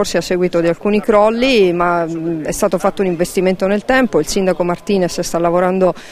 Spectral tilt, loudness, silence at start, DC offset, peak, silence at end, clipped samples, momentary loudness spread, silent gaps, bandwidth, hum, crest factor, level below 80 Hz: -5 dB/octave; -15 LUFS; 0 s; under 0.1%; 0 dBFS; 0 s; under 0.1%; 6 LU; none; 16 kHz; none; 14 dB; -38 dBFS